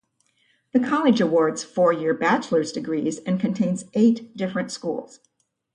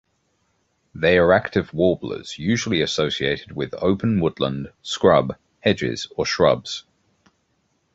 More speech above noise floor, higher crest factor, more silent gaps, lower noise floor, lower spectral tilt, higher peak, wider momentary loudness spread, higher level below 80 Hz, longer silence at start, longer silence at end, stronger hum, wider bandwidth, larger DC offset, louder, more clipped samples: second, 44 dB vs 48 dB; about the same, 16 dB vs 20 dB; neither; about the same, -66 dBFS vs -68 dBFS; about the same, -6 dB/octave vs -5 dB/octave; second, -6 dBFS vs -2 dBFS; second, 9 LU vs 12 LU; second, -68 dBFS vs -46 dBFS; second, 0.75 s vs 0.95 s; second, 0.7 s vs 1.15 s; neither; first, 10.5 kHz vs 8 kHz; neither; about the same, -22 LUFS vs -21 LUFS; neither